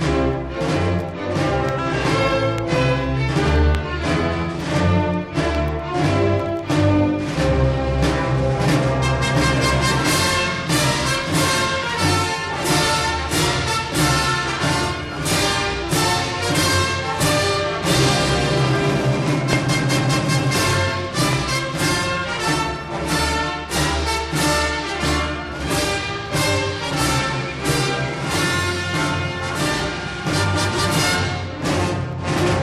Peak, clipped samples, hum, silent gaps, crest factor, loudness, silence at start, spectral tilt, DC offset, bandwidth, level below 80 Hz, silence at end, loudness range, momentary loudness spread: -4 dBFS; under 0.1%; none; none; 16 dB; -19 LUFS; 0 s; -4.5 dB/octave; under 0.1%; 15 kHz; -32 dBFS; 0 s; 3 LU; 5 LU